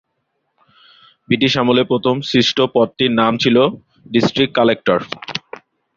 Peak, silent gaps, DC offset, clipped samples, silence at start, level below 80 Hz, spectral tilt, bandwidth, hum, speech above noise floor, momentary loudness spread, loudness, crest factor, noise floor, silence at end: -2 dBFS; none; under 0.1%; under 0.1%; 1.3 s; -54 dBFS; -5.5 dB/octave; 7.4 kHz; none; 55 dB; 7 LU; -16 LUFS; 16 dB; -70 dBFS; 0.6 s